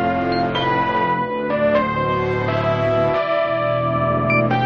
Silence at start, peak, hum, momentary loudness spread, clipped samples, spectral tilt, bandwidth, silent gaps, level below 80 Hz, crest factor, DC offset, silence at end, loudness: 0 s; -6 dBFS; none; 3 LU; under 0.1%; -8 dB/octave; 6.8 kHz; none; -42 dBFS; 12 dB; under 0.1%; 0 s; -19 LUFS